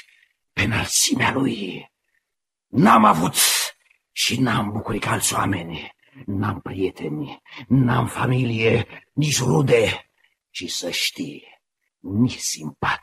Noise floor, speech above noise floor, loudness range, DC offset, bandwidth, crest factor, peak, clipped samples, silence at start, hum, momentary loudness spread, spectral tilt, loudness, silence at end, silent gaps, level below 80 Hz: -82 dBFS; 61 dB; 5 LU; under 0.1%; 15 kHz; 20 dB; -2 dBFS; under 0.1%; 0.55 s; none; 17 LU; -4 dB/octave; -20 LUFS; 0.05 s; none; -50 dBFS